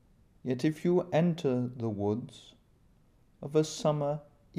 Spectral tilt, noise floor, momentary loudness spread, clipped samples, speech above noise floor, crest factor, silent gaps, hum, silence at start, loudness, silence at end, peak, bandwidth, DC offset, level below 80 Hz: -7 dB/octave; -64 dBFS; 12 LU; under 0.1%; 34 dB; 18 dB; none; none; 0.45 s; -31 LUFS; 0.35 s; -14 dBFS; 13.5 kHz; under 0.1%; -66 dBFS